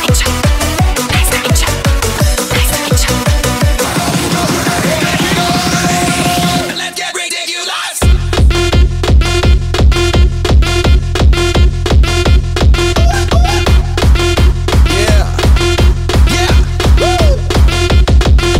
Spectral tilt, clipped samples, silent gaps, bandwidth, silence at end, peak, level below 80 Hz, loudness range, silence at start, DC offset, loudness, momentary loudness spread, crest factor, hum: -4.5 dB/octave; under 0.1%; none; 16.5 kHz; 0 s; 0 dBFS; -12 dBFS; 2 LU; 0 s; under 0.1%; -11 LUFS; 3 LU; 10 dB; none